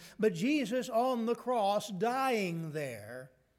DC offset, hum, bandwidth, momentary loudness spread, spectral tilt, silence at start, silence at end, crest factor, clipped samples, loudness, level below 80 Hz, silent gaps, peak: under 0.1%; none; 16.5 kHz; 10 LU; -5.5 dB/octave; 0 s; 0.3 s; 14 dB; under 0.1%; -33 LUFS; -78 dBFS; none; -18 dBFS